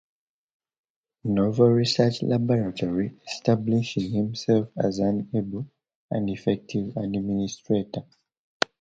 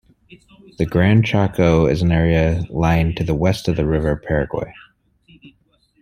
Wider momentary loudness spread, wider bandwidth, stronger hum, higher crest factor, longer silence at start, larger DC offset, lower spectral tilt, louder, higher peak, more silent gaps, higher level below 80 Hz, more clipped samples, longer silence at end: first, 11 LU vs 6 LU; second, 7.8 kHz vs 14 kHz; neither; first, 24 dB vs 18 dB; first, 1.25 s vs 0.8 s; neither; about the same, -6.5 dB/octave vs -7.5 dB/octave; second, -25 LUFS vs -18 LUFS; about the same, 0 dBFS vs -2 dBFS; first, 5.95-6.09 s vs none; second, -58 dBFS vs -34 dBFS; neither; first, 0.8 s vs 0.55 s